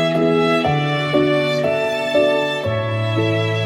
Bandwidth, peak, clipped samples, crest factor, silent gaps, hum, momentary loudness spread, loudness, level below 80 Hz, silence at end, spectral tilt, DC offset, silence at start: 16 kHz; -4 dBFS; under 0.1%; 14 dB; none; none; 4 LU; -18 LUFS; -52 dBFS; 0 s; -6.5 dB/octave; under 0.1%; 0 s